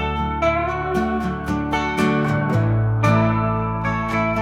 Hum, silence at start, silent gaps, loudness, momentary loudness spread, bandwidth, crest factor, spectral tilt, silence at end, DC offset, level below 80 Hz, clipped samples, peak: none; 0 s; none; -20 LUFS; 5 LU; 12 kHz; 14 dB; -7.5 dB/octave; 0 s; 0.1%; -36 dBFS; under 0.1%; -4 dBFS